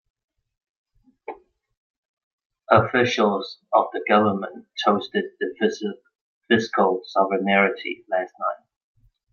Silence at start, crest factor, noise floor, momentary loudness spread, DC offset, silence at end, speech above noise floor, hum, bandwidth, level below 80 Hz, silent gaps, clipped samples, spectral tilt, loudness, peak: 1.3 s; 22 dB; -40 dBFS; 13 LU; under 0.1%; 0.75 s; 19 dB; none; 7 kHz; -66 dBFS; 1.77-2.17 s, 2.23-2.38 s, 2.46-2.50 s, 6.21-6.41 s; under 0.1%; -5.5 dB/octave; -22 LUFS; -2 dBFS